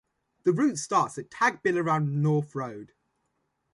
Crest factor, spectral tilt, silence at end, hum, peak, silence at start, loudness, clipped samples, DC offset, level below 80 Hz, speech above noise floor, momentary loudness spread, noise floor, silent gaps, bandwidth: 18 dB; -6 dB/octave; 0.9 s; none; -10 dBFS; 0.45 s; -27 LUFS; under 0.1%; under 0.1%; -72 dBFS; 50 dB; 10 LU; -76 dBFS; none; 11.5 kHz